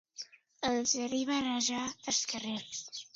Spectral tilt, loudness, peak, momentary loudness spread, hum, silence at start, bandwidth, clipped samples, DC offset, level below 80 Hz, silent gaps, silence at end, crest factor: -1.5 dB/octave; -33 LUFS; -16 dBFS; 12 LU; none; 0.15 s; 7.8 kHz; under 0.1%; under 0.1%; -70 dBFS; none; 0.1 s; 18 dB